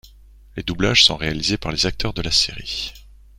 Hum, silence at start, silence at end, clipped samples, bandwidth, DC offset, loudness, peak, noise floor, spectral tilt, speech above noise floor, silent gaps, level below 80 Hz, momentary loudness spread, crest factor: none; 0.05 s; 0.3 s; under 0.1%; 16.5 kHz; under 0.1%; -18 LUFS; 0 dBFS; -46 dBFS; -3 dB/octave; 26 dB; none; -36 dBFS; 16 LU; 22 dB